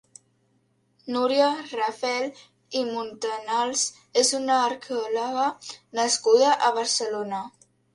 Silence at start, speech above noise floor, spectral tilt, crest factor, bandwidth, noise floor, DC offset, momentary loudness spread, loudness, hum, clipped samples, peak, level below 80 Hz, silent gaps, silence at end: 1.05 s; 43 dB; -1 dB/octave; 18 dB; 11.5 kHz; -68 dBFS; under 0.1%; 12 LU; -24 LUFS; none; under 0.1%; -8 dBFS; -76 dBFS; none; 0.45 s